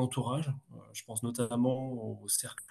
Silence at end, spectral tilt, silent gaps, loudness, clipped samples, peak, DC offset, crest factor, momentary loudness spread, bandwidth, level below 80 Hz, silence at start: 0.05 s; -5 dB/octave; none; -34 LUFS; under 0.1%; -14 dBFS; under 0.1%; 22 dB; 11 LU; 12.5 kHz; -72 dBFS; 0 s